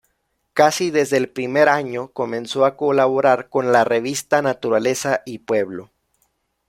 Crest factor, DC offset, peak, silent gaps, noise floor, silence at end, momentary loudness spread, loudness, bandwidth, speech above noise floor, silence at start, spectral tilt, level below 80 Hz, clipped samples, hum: 18 dB; under 0.1%; -2 dBFS; none; -70 dBFS; 0.85 s; 9 LU; -19 LUFS; 16.5 kHz; 52 dB; 0.55 s; -4 dB/octave; -64 dBFS; under 0.1%; none